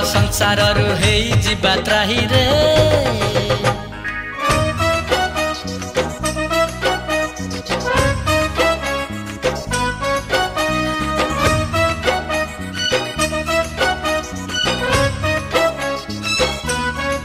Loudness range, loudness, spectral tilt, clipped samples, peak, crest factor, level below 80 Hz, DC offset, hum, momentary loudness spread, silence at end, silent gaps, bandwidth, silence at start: 4 LU; -17 LUFS; -4 dB/octave; under 0.1%; -2 dBFS; 16 dB; -32 dBFS; under 0.1%; none; 8 LU; 0 s; none; 16 kHz; 0 s